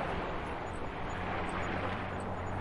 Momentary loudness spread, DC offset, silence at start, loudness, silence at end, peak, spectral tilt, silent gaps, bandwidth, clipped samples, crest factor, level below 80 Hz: 4 LU; under 0.1%; 0 s; -37 LUFS; 0 s; -22 dBFS; -6 dB/octave; none; 11.5 kHz; under 0.1%; 14 dB; -48 dBFS